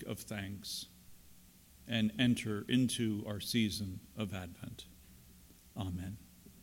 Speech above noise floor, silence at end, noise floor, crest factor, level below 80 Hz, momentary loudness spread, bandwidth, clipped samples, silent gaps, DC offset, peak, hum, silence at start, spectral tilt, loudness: 24 dB; 0 s; -61 dBFS; 20 dB; -62 dBFS; 19 LU; 17 kHz; under 0.1%; none; under 0.1%; -18 dBFS; none; 0 s; -5 dB/octave; -37 LUFS